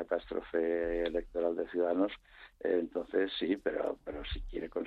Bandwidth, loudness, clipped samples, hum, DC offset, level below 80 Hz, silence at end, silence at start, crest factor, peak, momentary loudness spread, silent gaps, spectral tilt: 5.4 kHz; -34 LUFS; under 0.1%; none; under 0.1%; -50 dBFS; 0 s; 0 s; 18 dB; -16 dBFS; 8 LU; none; -7 dB/octave